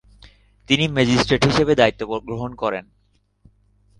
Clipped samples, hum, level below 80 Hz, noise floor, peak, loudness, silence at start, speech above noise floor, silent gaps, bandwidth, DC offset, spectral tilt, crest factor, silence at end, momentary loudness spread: under 0.1%; 50 Hz at -40 dBFS; -44 dBFS; -63 dBFS; -2 dBFS; -19 LUFS; 0.7 s; 44 dB; none; 10.5 kHz; under 0.1%; -5 dB/octave; 20 dB; 1.2 s; 11 LU